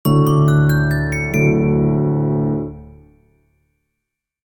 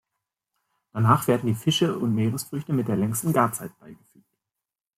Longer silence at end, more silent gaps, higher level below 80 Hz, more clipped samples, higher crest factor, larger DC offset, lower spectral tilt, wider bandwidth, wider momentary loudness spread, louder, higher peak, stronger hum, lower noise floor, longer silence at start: first, 1.6 s vs 1.05 s; neither; first, -36 dBFS vs -64 dBFS; neither; second, 14 dB vs 20 dB; neither; first, -8 dB/octave vs -5.5 dB/octave; first, 18 kHz vs 16 kHz; second, 7 LU vs 10 LU; first, -16 LUFS vs -24 LUFS; first, -2 dBFS vs -6 dBFS; neither; second, -79 dBFS vs -88 dBFS; second, 0.05 s vs 0.95 s